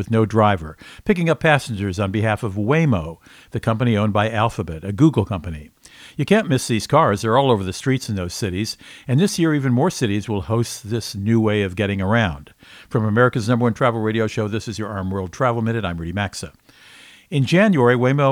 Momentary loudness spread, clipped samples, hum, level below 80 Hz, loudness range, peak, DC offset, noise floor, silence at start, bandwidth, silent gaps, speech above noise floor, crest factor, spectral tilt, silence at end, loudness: 10 LU; under 0.1%; none; -46 dBFS; 2 LU; 0 dBFS; under 0.1%; -46 dBFS; 0 s; 15.5 kHz; none; 27 dB; 18 dB; -6 dB/octave; 0 s; -20 LUFS